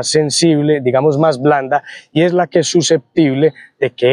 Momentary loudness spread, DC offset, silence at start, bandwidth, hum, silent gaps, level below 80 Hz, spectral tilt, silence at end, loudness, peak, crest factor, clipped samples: 7 LU; under 0.1%; 0 s; 12 kHz; none; none; -58 dBFS; -5 dB/octave; 0 s; -14 LUFS; 0 dBFS; 12 dB; under 0.1%